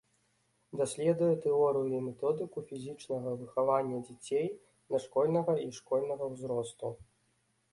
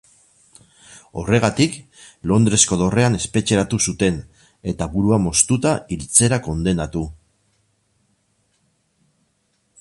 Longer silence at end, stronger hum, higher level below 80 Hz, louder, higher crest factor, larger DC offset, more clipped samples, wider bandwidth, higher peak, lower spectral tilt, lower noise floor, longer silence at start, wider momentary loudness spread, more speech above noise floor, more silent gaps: second, 0.7 s vs 2.65 s; neither; second, -72 dBFS vs -40 dBFS; second, -33 LUFS vs -18 LUFS; about the same, 18 dB vs 20 dB; neither; neither; about the same, 11.5 kHz vs 11.5 kHz; second, -16 dBFS vs 0 dBFS; first, -6.5 dB/octave vs -4.5 dB/octave; first, -75 dBFS vs -67 dBFS; second, 0.75 s vs 0.9 s; about the same, 13 LU vs 15 LU; second, 42 dB vs 48 dB; neither